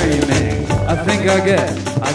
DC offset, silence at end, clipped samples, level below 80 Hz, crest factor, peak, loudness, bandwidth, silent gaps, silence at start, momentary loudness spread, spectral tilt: under 0.1%; 0 s; under 0.1%; -30 dBFS; 14 dB; -2 dBFS; -16 LUFS; 11 kHz; none; 0 s; 5 LU; -5.5 dB/octave